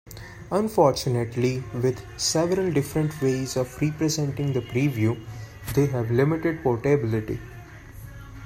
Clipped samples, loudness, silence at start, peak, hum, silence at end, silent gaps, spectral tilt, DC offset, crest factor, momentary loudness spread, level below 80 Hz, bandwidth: under 0.1%; -25 LUFS; 0.05 s; -6 dBFS; none; 0 s; none; -6 dB/octave; under 0.1%; 20 dB; 19 LU; -48 dBFS; 16 kHz